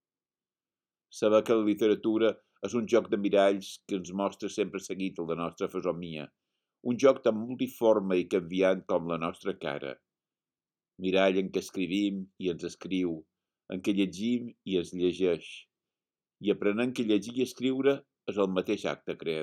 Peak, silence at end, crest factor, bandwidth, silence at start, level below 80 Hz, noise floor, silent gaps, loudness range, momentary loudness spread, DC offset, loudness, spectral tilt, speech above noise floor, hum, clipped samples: -10 dBFS; 0 s; 20 dB; 16.5 kHz; 1.15 s; -72 dBFS; under -90 dBFS; none; 5 LU; 11 LU; under 0.1%; -30 LUFS; -5.5 dB/octave; over 61 dB; none; under 0.1%